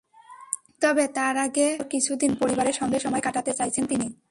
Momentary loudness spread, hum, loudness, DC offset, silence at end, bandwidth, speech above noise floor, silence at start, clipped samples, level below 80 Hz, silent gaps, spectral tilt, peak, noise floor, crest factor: 5 LU; none; -25 LUFS; under 0.1%; 0.15 s; 11.5 kHz; 23 dB; 0.3 s; under 0.1%; -60 dBFS; none; -3 dB/octave; -4 dBFS; -48 dBFS; 20 dB